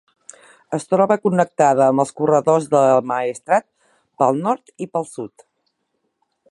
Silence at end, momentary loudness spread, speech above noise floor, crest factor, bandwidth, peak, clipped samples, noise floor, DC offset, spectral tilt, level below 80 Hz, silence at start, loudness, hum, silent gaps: 1.25 s; 12 LU; 55 dB; 18 dB; 11.5 kHz; -2 dBFS; under 0.1%; -72 dBFS; under 0.1%; -6.5 dB/octave; -68 dBFS; 0.7 s; -18 LUFS; none; none